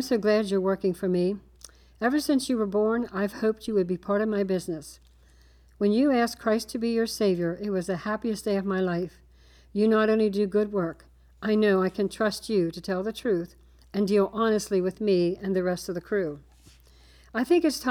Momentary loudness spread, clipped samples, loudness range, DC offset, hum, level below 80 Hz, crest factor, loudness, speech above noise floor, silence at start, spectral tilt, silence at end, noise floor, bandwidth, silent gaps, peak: 8 LU; under 0.1%; 2 LU; under 0.1%; none; -56 dBFS; 14 dB; -26 LUFS; 30 dB; 0 s; -6 dB/octave; 0 s; -56 dBFS; 18.5 kHz; none; -12 dBFS